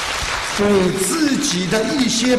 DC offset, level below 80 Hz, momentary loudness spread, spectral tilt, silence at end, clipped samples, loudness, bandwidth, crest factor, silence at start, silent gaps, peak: under 0.1%; -40 dBFS; 5 LU; -3.5 dB/octave; 0 s; under 0.1%; -17 LUFS; 13 kHz; 14 dB; 0 s; none; -4 dBFS